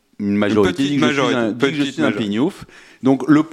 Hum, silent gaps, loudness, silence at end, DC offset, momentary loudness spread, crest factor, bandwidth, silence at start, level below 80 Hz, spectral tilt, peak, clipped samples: none; none; -18 LUFS; 0 s; under 0.1%; 6 LU; 16 dB; 12 kHz; 0.2 s; -52 dBFS; -6 dB/octave; 0 dBFS; under 0.1%